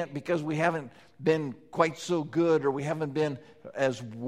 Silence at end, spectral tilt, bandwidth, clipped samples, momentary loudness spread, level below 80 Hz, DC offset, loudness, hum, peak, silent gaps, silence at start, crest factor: 0 s; -6 dB/octave; 13 kHz; under 0.1%; 11 LU; -68 dBFS; under 0.1%; -29 LUFS; none; -8 dBFS; none; 0 s; 20 dB